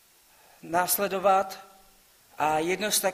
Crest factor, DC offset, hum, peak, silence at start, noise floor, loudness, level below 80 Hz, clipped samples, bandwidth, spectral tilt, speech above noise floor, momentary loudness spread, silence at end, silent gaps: 20 dB; under 0.1%; none; -10 dBFS; 0.65 s; -59 dBFS; -26 LUFS; -66 dBFS; under 0.1%; 15.5 kHz; -2.5 dB/octave; 33 dB; 8 LU; 0 s; none